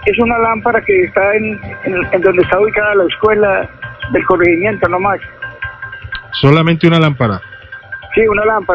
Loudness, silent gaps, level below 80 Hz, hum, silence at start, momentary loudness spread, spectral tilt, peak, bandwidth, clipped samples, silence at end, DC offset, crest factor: -12 LUFS; none; -38 dBFS; none; 0 s; 15 LU; -8.5 dB/octave; 0 dBFS; 8 kHz; 0.2%; 0 s; under 0.1%; 12 dB